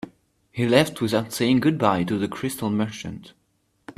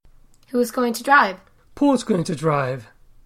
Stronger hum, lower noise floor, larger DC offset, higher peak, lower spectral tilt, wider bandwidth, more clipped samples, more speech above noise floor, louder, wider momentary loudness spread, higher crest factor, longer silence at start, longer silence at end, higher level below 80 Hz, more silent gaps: neither; first, -68 dBFS vs -50 dBFS; neither; about the same, -2 dBFS vs -2 dBFS; about the same, -5.5 dB/octave vs -5.5 dB/octave; about the same, 15.5 kHz vs 16 kHz; neither; first, 46 dB vs 30 dB; about the same, -22 LUFS vs -20 LUFS; first, 17 LU vs 12 LU; about the same, 22 dB vs 20 dB; second, 0.05 s vs 0.55 s; second, 0.05 s vs 0.4 s; about the same, -58 dBFS vs -54 dBFS; neither